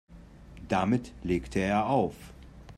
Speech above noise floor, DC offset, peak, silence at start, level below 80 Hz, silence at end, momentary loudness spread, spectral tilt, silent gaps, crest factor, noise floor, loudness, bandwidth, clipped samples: 21 dB; under 0.1%; -12 dBFS; 0.1 s; -48 dBFS; 0.05 s; 22 LU; -7 dB/octave; none; 18 dB; -49 dBFS; -29 LUFS; 13 kHz; under 0.1%